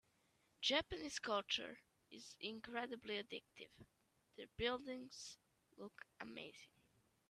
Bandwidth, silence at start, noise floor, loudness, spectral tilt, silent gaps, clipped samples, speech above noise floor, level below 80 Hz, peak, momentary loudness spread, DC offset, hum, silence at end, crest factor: 13.5 kHz; 0.6 s; -80 dBFS; -45 LUFS; -2.5 dB/octave; none; under 0.1%; 32 dB; -72 dBFS; -24 dBFS; 20 LU; under 0.1%; none; 0.65 s; 24 dB